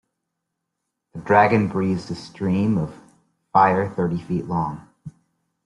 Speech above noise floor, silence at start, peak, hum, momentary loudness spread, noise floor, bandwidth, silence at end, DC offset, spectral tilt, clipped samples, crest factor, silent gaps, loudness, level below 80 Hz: 60 dB; 1.15 s; -2 dBFS; none; 16 LU; -80 dBFS; 11 kHz; 0.55 s; under 0.1%; -8 dB/octave; under 0.1%; 20 dB; none; -21 LUFS; -56 dBFS